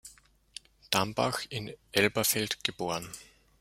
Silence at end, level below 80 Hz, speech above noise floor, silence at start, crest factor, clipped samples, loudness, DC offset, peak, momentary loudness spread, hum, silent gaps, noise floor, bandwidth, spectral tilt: 0.4 s; -64 dBFS; 27 dB; 0.05 s; 26 dB; under 0.1%; -30 LUFS; under 0.1%; -6 dBFS; 21 LU; none; none; -58 dBFS; 16.5 kHz; -3 dB/octave